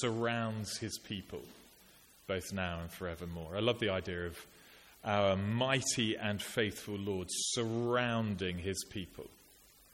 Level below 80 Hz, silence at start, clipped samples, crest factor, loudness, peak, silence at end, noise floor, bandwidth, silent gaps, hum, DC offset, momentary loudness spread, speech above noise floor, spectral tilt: -62 dBFS; 0 s; under 0.1%; 22 dB; -36 LUFS; -16 dBFS; 0.6 s; -62 dBFS; 16.5 kHz; none; none; under 0.1%; 14 LU; 26 dB; -4 dB/octave